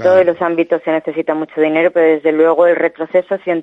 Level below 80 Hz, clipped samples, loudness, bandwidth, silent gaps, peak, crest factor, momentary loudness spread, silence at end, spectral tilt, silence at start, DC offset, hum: -66 dBFS; under 0.1%; -14 LUFS; 6 kHz; none; 0 dBFS; 12 dB; 7 LU; 0 s; -7.5 dB/octave; 0 s; under 0.1%; none